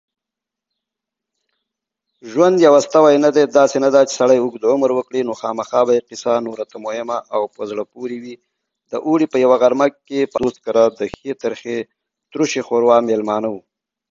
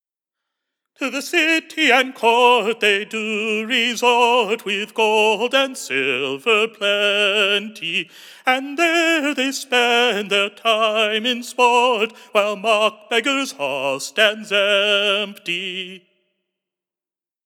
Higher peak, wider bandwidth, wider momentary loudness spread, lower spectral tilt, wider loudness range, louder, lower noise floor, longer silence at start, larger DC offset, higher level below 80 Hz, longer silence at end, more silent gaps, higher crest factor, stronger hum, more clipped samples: about the same, 0 dBFS vs -2 dBFS; second, 7.8 kHz vs 18.5 kHz; first, 15 LU vs 8 LU; first, -5 dB/octave vs -2 dB/octave; first, 7 LU vs 2 LU; about the same, -16 LUFS vs -18 LUFS; second, -85 dBFS vs under -90 dBFS; first, 2.25 s vs 1 s; neither; first, -60 dBFS vs under -90 dBFS; second, 0.5 s vs 1.5 s; neither; about the same, 18 dB vs 18 dB; neither; neither